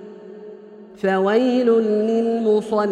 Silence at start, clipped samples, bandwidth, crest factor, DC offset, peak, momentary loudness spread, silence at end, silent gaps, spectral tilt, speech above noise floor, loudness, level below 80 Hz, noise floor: 0 s; under 0.1%; 9.4 kHz; 14 dB; under 0.1%; -6 dBFS; 21 LU; 0 s; none; -7 dB/octave; 23 dB; -19 LUFS; -66 dBFS; -41 dBFS